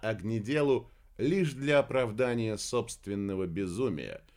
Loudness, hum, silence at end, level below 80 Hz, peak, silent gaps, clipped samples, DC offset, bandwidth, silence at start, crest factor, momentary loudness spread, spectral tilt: -31 LUFS; none; 0.2 s; -58 dBFS; -14 dBFS; none; under 0.1%; under 0.1%; 16 kHz; 0 s; 18 dB; 7 LU; -6 dB/octave